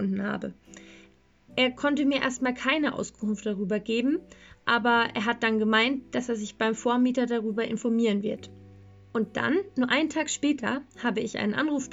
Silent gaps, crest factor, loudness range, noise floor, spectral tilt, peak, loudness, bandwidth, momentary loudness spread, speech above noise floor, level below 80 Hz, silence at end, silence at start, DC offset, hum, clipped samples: none; 18 dB; 3 LU; -58 dBFS; -4 dB/octave; -8 dBFS; -27 LUFS; 8 kHz; 9 LU; 31 dB; -62 dBFS; 0 s; 0 s; under 0.1%; none; under 0.1%